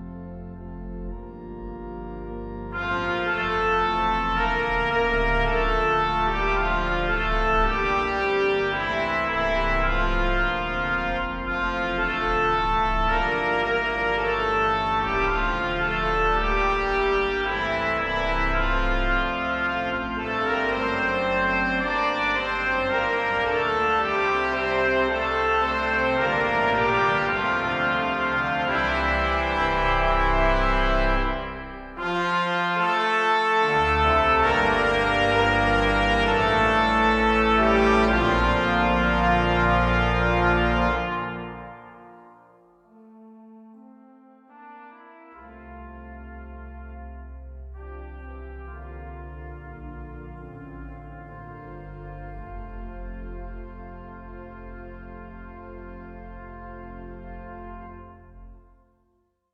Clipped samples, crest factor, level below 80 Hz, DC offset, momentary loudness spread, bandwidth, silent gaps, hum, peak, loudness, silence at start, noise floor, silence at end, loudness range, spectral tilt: under 0.1%; 18 dB; -32 dBFS; under 0.1%; 21 LU; 9.4 kHz; none; none; -6 dBFS; -22 LUFS; 0 s; -69 dBFS; 0.95 s; 21 LU; -6 dB/octave